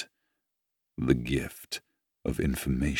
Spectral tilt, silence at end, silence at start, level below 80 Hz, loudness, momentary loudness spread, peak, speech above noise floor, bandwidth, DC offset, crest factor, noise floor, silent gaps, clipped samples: -6 dB/octave; 0 s; 0 s; -42 dBFS; -31 LUFS; 12 LU; -10 dBFS; 55 dB; 19.5 kHz; under 0.1%; 22 dB; -84 dBFS; none; under 0.1%